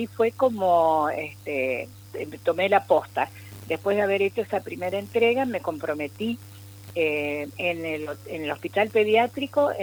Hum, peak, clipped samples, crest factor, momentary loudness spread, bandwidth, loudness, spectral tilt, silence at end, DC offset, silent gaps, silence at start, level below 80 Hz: 50 Hz at -45 dBFS; -6 dBFS; under 0.1%; 20 dB; 12 LU; over 20 kHz; -25 LUFS; -5.5 dB/octave; 0 s; under 0.1%; none; 0 s; -66 dBFS